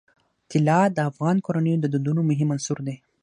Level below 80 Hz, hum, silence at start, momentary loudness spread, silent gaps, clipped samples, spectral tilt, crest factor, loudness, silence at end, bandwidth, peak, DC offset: -68 dBFS; none; 0.5 s; 8 LU; none; under 0.1%; -7 dB/octave; 16 dB; -23 LUFS; 0.25 s; 10.5 kHz; -6 dBFS; under 0.1%